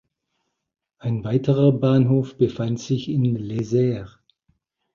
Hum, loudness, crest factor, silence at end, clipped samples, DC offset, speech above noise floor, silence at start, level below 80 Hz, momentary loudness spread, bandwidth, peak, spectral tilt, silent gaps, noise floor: none; -21 LUFS; 18 dB; 0.85 s; under 0.1%; under 0.1%; 55 dB; 1.05 s; -54 dBFS; 9 LU; 7.2 kHz; -4 dBFS; -8.5 dB/octave; none; -76 dBFS